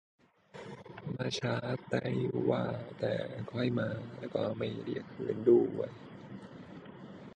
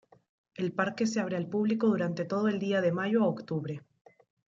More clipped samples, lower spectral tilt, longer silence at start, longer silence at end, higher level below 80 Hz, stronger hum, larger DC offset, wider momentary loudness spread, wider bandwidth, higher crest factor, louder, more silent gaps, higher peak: neither; about the same, -7 dB/octave vs -6.5 dB/octave; about the same, 0.55 s vs 0.6 s; second, 0.05 s vs 0.8 s; first, -68 dBFS vs -76 dBFS; neither; neither; first, 20 LU vs 8 LU; first, 9.6 kHz vs 7.8 kHz; about the same, 22 dB vs 18 dB; second, -34 LUFS vs -30 LUFS; neither; about the same, -14 dBFS vs -12 dBFS